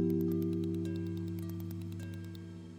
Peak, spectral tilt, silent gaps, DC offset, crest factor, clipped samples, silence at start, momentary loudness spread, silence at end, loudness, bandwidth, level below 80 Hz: -20 dBFS; -8.5 dB/octave; none; under 0.1%; 16 dB; under 0.1%; 0 s; 12 LU; 0 s; -38 LUFS; 16 kHz; -70 dBFS